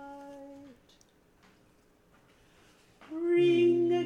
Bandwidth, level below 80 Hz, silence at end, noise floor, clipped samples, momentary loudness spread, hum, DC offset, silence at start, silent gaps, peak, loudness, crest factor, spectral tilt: 6.8 kHz; -72 dBFS; 0 s; -64 dBFS; under 0.1%; 24 LU; none; under 0.1%; 0 s; none; -16 dBFS; -26 LUFS; 14 dB; -7 dB/octave